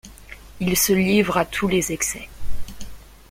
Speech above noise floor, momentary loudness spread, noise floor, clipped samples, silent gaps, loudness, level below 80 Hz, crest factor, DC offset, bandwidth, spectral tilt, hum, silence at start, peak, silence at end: 21 dB; 24 LU; -42 dBFS; under 0.1%; none; -20 LUFS; -38 dBFS; 18 dB; under 0.1%; 16.5 kHz; -4 dB/octave; none; 0.05 s; -4 dBFS; 0.3 s